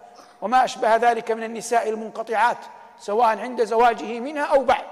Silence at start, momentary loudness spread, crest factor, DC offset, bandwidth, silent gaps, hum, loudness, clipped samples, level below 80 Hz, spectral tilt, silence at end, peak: 0.05 s; 10 LU; 14 dB; under 0.1%; 13.5 kHz; none; none; -21 LUFS; under 0.1%; -58 dBFS; -3 dB/octave; 0 s; -6 dBFS